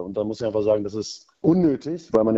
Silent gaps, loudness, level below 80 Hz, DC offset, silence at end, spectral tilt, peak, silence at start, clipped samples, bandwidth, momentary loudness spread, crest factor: none; -23 LUFS; -54 dBFS; under 0.1%; 0 s; -7.5 dB/octave; -4 dBFS; 0 s; under 0.1%; 7.8 kHz; 10 LU; 18 dB